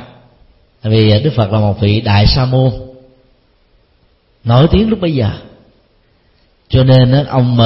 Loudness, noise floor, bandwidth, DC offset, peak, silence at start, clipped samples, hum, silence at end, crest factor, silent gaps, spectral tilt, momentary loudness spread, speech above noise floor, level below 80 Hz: -11 LUFS; -53 dBFS; 5.8 kHz; under 0.1%; 0 dBFS; 0 s; under 0.1%; none; 0 s; 12 dB; none; -10 dB/octave; 9 LU; 43 dB; -28 dBFS